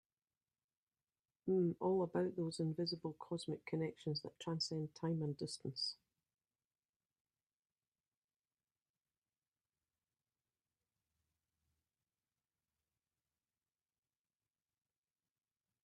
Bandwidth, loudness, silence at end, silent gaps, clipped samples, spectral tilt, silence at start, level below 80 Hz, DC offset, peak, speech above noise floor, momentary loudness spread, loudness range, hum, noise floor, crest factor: 11 kHz; -42 LUFS; 9.9 s; none; under 0.1%; -6 dB/octave; 1.45 s; -84 dBFS; under 0.1%; -26 dBFS; over 49 dB; 8 LU; 8 LU; none; under -90 dBFS; 20 dB